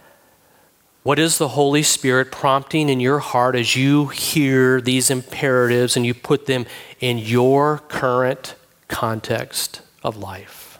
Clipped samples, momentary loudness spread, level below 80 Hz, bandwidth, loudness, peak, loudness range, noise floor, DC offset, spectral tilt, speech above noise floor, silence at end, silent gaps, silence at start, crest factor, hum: under 0.1%; 12 LU; -58 dBFS; 17.5 kHz; -18 LUFS; -2 dBFS; 4 LU; -56 dBFS; under 0.1%; -4 dB/octave; 38 dB; 0.1 s; none; 1.05 s; 16 dB; none